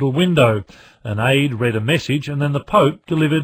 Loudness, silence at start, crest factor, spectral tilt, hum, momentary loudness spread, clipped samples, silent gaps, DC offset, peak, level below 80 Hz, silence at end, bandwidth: -17 LUFS; 0 s; 16 dB; -6.5 dB/octave; none; 7 LU; under 0.1%; none; under 0.1%; -2 dBFS; -48 dBFS; 0 s; 15.5 kHz